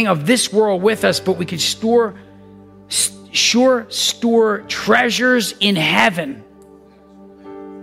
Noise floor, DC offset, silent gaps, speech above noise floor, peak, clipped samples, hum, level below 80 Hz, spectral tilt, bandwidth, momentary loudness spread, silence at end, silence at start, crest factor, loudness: -45 dBFS; under 0.1%; none; 29 dB; -2 dBFS; under 0.1%; none; -58 dBFS; -3 dB/octave; 16 kHz; 8 LU; 0 s; 0 s; 16 dB; -16 LUFS